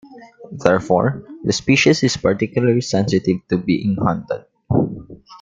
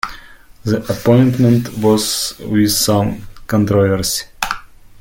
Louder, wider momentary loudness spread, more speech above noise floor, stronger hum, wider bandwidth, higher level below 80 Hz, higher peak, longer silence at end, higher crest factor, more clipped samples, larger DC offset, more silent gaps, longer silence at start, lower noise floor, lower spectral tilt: second, -18 LUFS vs -15 LUFS; about the same, 11 LU vs 10 LU; second, 22 dB vs 26 dB; neither; second, 9.4 kHz vs 17 kHz; second, -48 dBFS vs -40 dBFS; about the same, 0 dBFS vs 0 dBFS; about the same, 0.05 s vs 0 s; about the same, 18 dB vs 16 dB; neither; neither; neither; about the same, 0.05 s vs 0.05 s; about the same, -39 dBFS vs -40 dBFS; about the same, -5.5 dB/octave vs -5 dB/octave